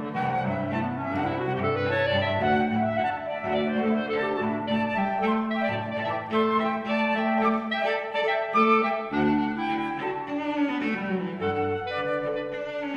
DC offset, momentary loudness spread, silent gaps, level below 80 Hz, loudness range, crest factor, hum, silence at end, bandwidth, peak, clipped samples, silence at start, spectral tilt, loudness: under 0.1%; 5 LU; none; -58 dBFS; 3 LU; 16 dB; none; 0 s; 7 kHz; -10 dBFS; under 0.1%; 0 s; -7.5 dB/octave; -26 LUFS